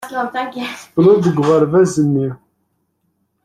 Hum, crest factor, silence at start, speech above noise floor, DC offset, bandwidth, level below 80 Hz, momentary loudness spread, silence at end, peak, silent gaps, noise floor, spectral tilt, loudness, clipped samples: none; 14 dB; 0 s; 52 dB; under 0.1%; 14 kHz; -54 dBFS; 12 LU; 1.1 s; -2 dBFS; none; -67 dBFS; -7 dB/octave; -15 LUFS; under 0.1%